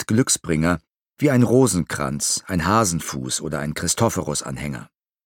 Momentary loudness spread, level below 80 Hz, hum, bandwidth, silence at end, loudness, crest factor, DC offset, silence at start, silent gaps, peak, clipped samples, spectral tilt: 10 LU; -44 dBFS; none; 17.5 kHz; 0.4 s; -21 LUFS; 18 dB; under 0.1%; 0 s; none; -2 dBFS; under 0.1%; -4.5 dB/octave